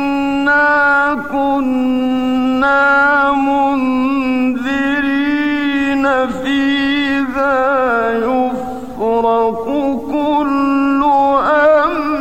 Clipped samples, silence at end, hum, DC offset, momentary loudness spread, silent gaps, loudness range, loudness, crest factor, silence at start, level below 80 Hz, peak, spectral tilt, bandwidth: under 0.1%; 0 s; none; 1%; 6 LU; none; 3 LU; -14 LUFS; 12 dB; 0 s; -44 dBFS; -2 dBFS; -5 dB/octave; 8.4 kHz